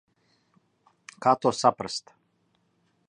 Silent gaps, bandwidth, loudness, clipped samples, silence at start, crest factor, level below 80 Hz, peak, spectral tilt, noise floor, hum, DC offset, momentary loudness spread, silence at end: none; 10.5 kHz; -25 LUFS; under 0.1%; 1.2 s; 24 dB; -70 dBFS; -6 dBFS; -4 dB/octave; -70 dBFS; none; under 0.1%; 11 LU; 1.1 s